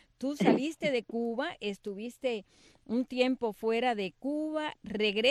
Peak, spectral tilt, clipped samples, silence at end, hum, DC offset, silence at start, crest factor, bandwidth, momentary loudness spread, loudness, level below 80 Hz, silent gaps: -12 dBFS; -5 dB/octave; under 0.1%; 0 s; none; under 0.1%; 0.2 s; 20 dB; 14 kHz; 10 LU; -32 LUFS; -68 dBFS; none